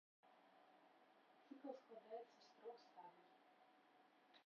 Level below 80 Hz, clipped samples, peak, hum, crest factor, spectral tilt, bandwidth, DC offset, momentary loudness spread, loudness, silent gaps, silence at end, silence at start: under -90 dBFS; under 0.1%; -40 dBFS; none; 24 dB; -2.5 dB/octave; 6.8 kHz; under 0.1%; 8 LU; -61 LUFS; none; 0 s; 0.25 s